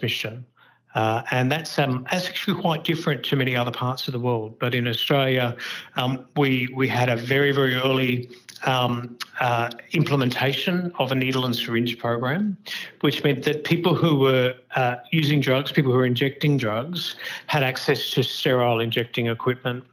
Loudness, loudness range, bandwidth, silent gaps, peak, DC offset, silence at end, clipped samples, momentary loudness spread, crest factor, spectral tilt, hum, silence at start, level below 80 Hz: -23 LUFS; 3 LU; over 20 kHz; none; -6 dBFS; under 0.1%; 0.1 s; under 0.1%; 7 LU; 18 dB; -6 dB/octave; none; 0 s; -72 dBFS